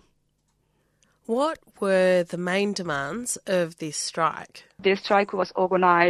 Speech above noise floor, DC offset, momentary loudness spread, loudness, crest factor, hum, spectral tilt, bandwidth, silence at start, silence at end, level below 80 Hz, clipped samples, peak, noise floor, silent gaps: 46 dB; under 0.1%; 9 LU; -24 LUFS; 20 dB; none; -4 dB/octave; 13.5 kHz; 1.3 s; 0 s; -66 dBFS; under 0.1%; -4 dBFS; -70 dBFS; none